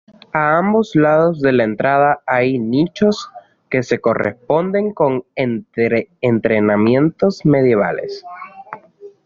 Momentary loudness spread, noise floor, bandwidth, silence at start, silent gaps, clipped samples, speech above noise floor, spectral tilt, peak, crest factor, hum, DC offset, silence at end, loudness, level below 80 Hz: 13 LU; -41 dBFS; 7.4 kHz; 0.35 s; none; under 0.1%; 25 dB; -6 dB/octave; 0 dBFS; 16 dB; none; under 0.1%; 0.15 s; -16 LUFS; -54 dBFS